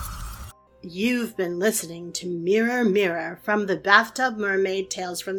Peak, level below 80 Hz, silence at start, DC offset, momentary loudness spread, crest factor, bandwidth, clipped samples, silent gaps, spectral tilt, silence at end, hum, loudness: 0 dBFS; -48 dBFS; 0 s; under 0.1%; 15 LU; 24 dB; 19 kHz; under 0.1%; none; -3.5 dB/octave; 0 s; none; -23 LUFS